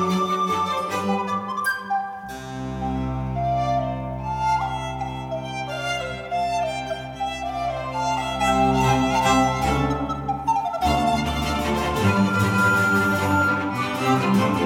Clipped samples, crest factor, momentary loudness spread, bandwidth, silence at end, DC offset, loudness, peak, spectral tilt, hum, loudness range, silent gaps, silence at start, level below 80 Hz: under 0.1%; 16 dB; 10 LU; 19 kHz; 0 s; under 0.1%; -23 LUFS; -8 dBFS; -5.5 dB/octave; none; 6 LU; none; 0 s; -38 dBFS